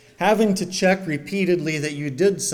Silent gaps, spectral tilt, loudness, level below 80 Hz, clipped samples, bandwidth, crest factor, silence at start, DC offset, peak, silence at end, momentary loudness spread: none; -4.5 dB/octave; -21 LUFS; -60 dBFS; under 0.1%; 17.5 kHz; 16 dB; 0.2 s; under 0.1%; -6 dBFS; 0 s; 6 LU